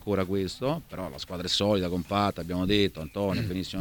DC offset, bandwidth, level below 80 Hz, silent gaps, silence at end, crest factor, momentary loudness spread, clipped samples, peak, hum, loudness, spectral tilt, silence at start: under 0.1%; 19 kHz; -50 dBFS; none; 0 s; 18 dB; 10 LU; under 0.1%; -10 dBFS; none; -28 LUFS; -5.5 dB/octave; 0 s